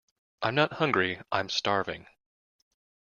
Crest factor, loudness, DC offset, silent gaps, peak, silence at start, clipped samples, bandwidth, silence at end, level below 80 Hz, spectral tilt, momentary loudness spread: 22 dB; -28 LUFS; under 0.1%; none; -8 dBFS; 0.4 s; under 0.1%; 7.4 kHz; 1.15 s; -68 dBFS; -4.5 dB/octave; 8 LU